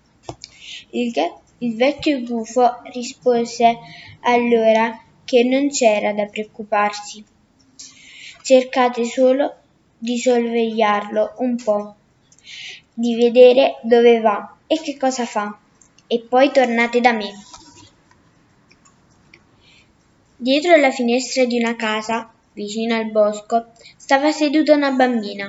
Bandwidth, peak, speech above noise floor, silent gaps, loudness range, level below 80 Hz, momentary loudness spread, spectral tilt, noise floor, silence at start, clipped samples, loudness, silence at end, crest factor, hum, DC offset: 8 kHz; 0 dBFS; 39 dB; none; 5 LU; -64 dBFS; 19 LU; -3.5 dB/octave; -56 dBFS; 0.3 s; under 0.1%; -17 LUFS; 0 s; 18 dB; none; under 0.1%